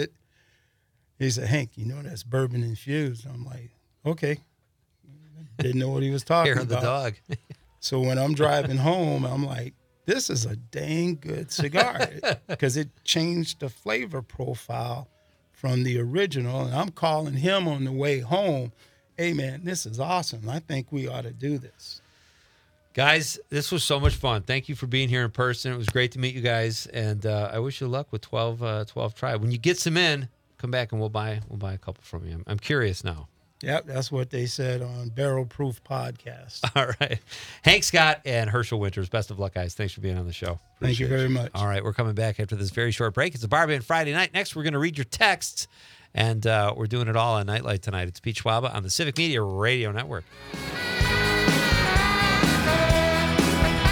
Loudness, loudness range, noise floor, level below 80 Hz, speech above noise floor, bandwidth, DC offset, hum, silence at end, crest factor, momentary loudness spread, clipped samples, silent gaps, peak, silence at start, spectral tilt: -25 LUFS; 7 LU; -69 dBFS; -42 dBFS; 43 dB; 19 kHz; under 0.1%; none; 0 s; 24 dB; 13 LU; under 0.1%; none; -2 dBFS; 0 s; -4.5 dB/octave